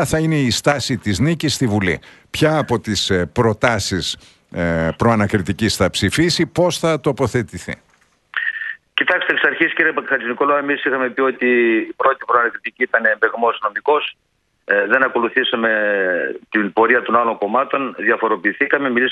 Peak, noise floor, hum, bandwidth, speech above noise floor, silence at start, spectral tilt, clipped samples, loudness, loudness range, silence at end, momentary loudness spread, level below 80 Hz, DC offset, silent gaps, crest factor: 0 dBFS; -49 dBFS; none; 12.5 kHz; 31 dB; 0 s; -4.5 dB/octave; under 0.1%; -17 LUFS; 2 LU; 0 s; 7 LU; -46 dBFS; under 0.1%; none; 18 dB